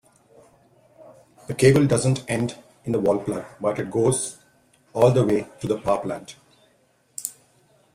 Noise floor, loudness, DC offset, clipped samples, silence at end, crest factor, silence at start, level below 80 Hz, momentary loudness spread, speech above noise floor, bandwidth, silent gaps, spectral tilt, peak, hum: -62 dBFS; -23 LUFS; under 0.1%; under 0.1%; 0.65 s; 20 dB; 1 s; -56 dBFS; 16 LU; 41 dB; 15.5 kHz; none; -6 dB/octave; -4 dBFS; none